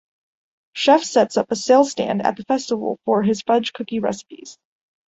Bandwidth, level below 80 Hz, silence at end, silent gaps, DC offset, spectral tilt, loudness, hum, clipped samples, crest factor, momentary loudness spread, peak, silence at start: 8.2 kHz; -64 dBFS; 0.55 s; none; under 0.1%; -4.5 dB/octave; -19 LUFS; none; under 0.1%; 18 dB; 11 LU; -2 dBFS; 0.75 s